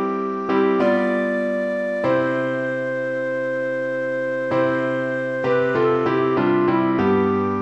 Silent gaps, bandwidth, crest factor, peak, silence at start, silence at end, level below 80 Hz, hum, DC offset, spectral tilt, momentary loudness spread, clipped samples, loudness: none; 8.4 kHz; 14 dB; -6 dBFS; 0 s; 0 s; -60 dBFS; none; 0.1%; -8 dB/octave; 5 LU; under 0.1%; -21 LUFS